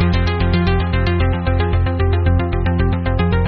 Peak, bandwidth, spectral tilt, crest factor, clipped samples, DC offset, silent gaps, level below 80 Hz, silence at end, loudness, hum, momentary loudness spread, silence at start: -2 dBFS; 5.4 kHz; -6.5 dB/octave; 12 dB; under 0.1%; under 0.1%; none; -24 dBFS; 0 s; -17 LUFS; none; 2 LU; 0 s